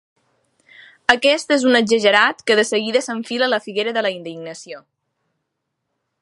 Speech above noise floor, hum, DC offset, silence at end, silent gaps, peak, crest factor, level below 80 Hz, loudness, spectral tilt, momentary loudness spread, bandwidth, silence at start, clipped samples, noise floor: 58 dB; none; under 0.1%; 1.45 s; none; 0 dBFS; 20 dB; -64 dBFS; -17 LUFS; -2.5 dB/octave; 18 LU; 11.5 kHz; 1.1 s; under 0.1%; -76 dBFS